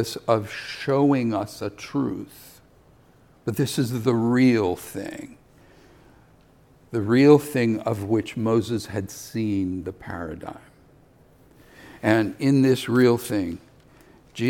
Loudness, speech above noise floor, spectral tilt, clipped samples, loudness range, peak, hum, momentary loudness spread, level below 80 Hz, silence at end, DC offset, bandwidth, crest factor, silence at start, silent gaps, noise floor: -23 LUFS; 33 dB; -6.5 dB/octave; under 0.1%; 6 LU; -4 dBFS; none; 16 LU; -58 dBFS; 0 s; under 0.1%; 18 kHz; 20 dB; 0 s; none; -55 dBFS